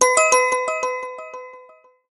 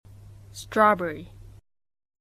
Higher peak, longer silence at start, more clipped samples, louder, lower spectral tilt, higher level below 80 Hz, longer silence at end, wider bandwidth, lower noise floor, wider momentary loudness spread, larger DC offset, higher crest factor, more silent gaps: first, 0 dBFS vs -6 dBFS; second, 0 s vs 0.55 s; neither; first, -18 LUFS vs -23 LUFS; second, 1 dB/octave vs -5 dB/octave; second, -68 dBFS vs -54 dBFS; second, 0.5 s vs 0.95 s; second, 12 kHz vs 15 kHz; about the same, -49 dBFS vs -47 dBFS; about the same, 22 LU vs 22 LU; neither; about the same, 20 dB vs 22 dB; neither